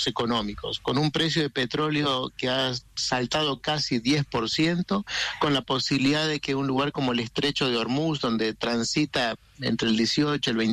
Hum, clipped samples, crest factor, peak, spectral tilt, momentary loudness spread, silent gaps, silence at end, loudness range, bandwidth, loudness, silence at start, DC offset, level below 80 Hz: none; under 0.1%; 12 dB; -14 dBFS; -4.5 dB/octave; 4 LU; none; 0 s; 1 LU; 13 kHz; -25 LUFS; 0 s; under 0.1%; -54 dBFS